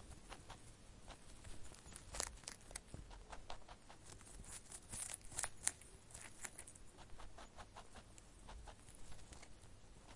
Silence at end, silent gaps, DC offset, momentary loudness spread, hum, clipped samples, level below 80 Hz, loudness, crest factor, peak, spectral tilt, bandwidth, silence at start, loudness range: 0 s; none; under 0.1%; 15 LU; none; under 0.1%; -62 dBFS; -52 LUFS; 40 dB; -14 dBFS; -1.5 dB/octave; 11.5 kHz; 0 s; 9 LU